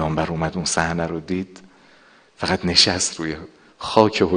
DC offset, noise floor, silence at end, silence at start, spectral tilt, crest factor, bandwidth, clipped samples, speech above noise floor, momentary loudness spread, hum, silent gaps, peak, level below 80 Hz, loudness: under 0.1%; -52 dBFS; 0 s; 0 s; -3.5 dB/octave; 22 dB; 10 kHz; under 0.1%; 31 dB; 14 LU; none; none; 0 dBFS; -48 dBFS; -20 LUFS